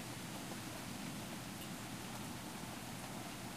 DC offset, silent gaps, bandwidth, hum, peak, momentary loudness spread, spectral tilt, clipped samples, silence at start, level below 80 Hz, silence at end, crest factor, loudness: under 0.1%; none; 15.5 kHz; none; -32 dBFS; 1 LU; -3.5 dB/octave; under 0.1%; 0 s; -66 dBFS; 0 s; 14 dB; -46 LUFS